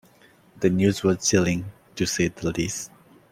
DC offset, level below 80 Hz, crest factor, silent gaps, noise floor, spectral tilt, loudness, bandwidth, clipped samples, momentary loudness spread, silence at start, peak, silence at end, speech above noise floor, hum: under 0.1%; -52 dBFS; 18 dB; none; -55 dBFS; -4.5 dB/octave; -24 LUFS; 16 kHz; under 0.1%; 11 LU; 0.55 s; -6 dBFS; 0.45 s; 33 dB; none